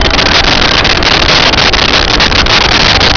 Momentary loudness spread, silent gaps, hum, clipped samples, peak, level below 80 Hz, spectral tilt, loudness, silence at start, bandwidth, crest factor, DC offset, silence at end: 2 LU; none; none; under 0.1%; 0 dBFS; -18 dBFS; -3 dB/octave; -5 LUFS; 0 s; 5.4 kHz; 6 dB; under 0.1%; 0 s